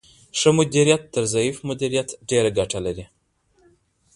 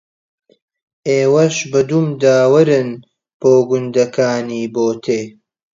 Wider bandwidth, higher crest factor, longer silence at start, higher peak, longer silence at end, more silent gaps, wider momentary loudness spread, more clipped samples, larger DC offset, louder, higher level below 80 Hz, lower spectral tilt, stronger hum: first, 11.5 kHz vs 7.8 kHz; first, 22 dB vs 14 dB; second, 0.35 s vs 1.05 s; about the same, -2 dBFS vs 0 dBFS; first, 1.1 s vs 0.45 s; second, none vs 3.34-3.40 s; about the same, 10 LU vs 10 LU; neither; neither; second, -21 LUFS vs -15 LUFS; first, -50 dBFS vs -62 dBFS; second, -4.5 dB/octave vs -6 dB/octave; neither